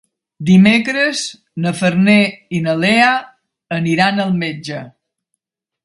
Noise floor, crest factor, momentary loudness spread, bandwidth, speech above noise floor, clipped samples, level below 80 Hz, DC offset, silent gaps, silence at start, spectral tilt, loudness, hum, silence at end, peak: -75 dBFS; 16 dB; 13 LU; 11.5 kHz; 61 dB; under 0.1%; -56 dBFS; under 0.1%; none; 0.4 s; -5.5 dB/octave; -14 LUFS; none; 0.95 s; 0 dBFS